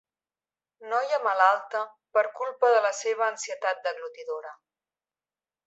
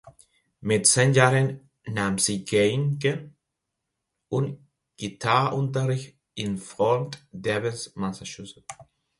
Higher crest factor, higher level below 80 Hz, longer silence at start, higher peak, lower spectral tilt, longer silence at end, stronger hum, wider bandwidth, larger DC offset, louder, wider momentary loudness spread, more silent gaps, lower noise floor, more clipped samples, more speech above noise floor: about the same, 20 dB vs 24 dB; second, under -90 dBFS vs -60 dBFS; first, 0.8 s vs 0.05 s; second, -8 dBFS vs -2 dBFS; second, 1 dB/octave vs -4.5 dB/octave; first, 1.15 s vs 0.35 s; neither; second, 8.2 kHz vs 11.5 kHz; neither; about the same, -26 LUFS vs -24 LUFS; second, 14 LU vs 19 LU; neither; first, under -90 dBFS vs -82 dBFS; neither; first, over 64 dB vs 58 dB